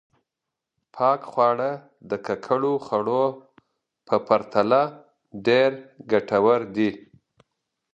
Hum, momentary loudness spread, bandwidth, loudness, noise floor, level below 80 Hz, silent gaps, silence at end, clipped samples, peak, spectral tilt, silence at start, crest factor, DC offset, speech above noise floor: none; 10 LU; 7.8 kHz; -23 LUFS; -85 dBFS; -68 dBFS; none; 0.95 s; under 0.1%; -4 dBFS; -7 dB/octave; 0.95 s; 20 dB; under 0.1%; 63 dB